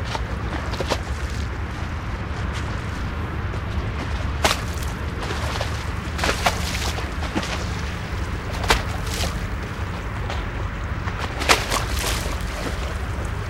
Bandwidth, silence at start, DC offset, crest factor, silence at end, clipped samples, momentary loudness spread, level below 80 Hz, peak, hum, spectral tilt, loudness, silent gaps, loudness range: 16.5 kHz; 0 s; under 0.1%; 24 dB; 0 s; under 0.1%; 8 LU; -30 dBFS; 0 dBFS; none; -4 dB/octave; -25 LUFS; none; 3 LU